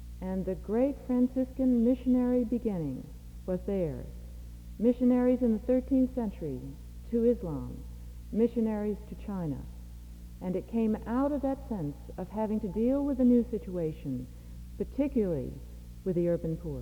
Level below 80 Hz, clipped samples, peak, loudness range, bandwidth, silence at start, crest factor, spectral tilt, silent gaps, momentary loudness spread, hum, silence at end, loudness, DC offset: -46 dBFS; under 0.1%; -14 dBFS; 4 LU; 19.5 kHz; 0 s; 16 dB; -9.5 dB/octave; none; 19 LU; none; 0 s; -30 LUFS; under 0.1%